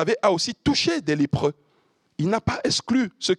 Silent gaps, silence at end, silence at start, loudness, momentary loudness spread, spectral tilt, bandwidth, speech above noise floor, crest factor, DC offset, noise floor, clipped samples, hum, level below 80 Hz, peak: none; 0.05 s; 0 s; -23 LUFS; 5 LU; -4.5 dB/octave; 11.5 kHz; 43 dB; 18 dB; under 0.1%; -65 dBFS; under 0.1%; none; -52 dBFS; -6 dBFS